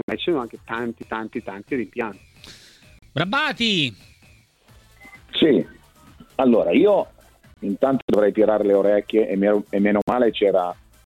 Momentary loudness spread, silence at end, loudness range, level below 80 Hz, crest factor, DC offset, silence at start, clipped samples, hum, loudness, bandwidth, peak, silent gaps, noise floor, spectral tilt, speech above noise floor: 13 LU; 0.35 s; 7 LU; -54 dBFS; 16 dB; under 0.1%; 0.1 s; under 0.1%; none; -21 LUFS; 13.5 kHz; -6 dBFS; 8.02-8.08 s, 10.02-10.07 s; -54 dBFS; -6 dB/octave; 34 dB